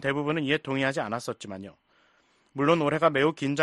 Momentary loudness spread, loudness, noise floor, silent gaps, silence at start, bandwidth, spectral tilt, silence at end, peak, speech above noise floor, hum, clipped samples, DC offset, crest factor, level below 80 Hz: 18 LU; -26 LUFS; -65 dBFS; none; 0 s; 11.5 kHz; -5.5 dB/octave; 0 s; -8 dBFS; 39 dB; none; under 0.1%; under 0.1%; 20 dB; -64 dBFS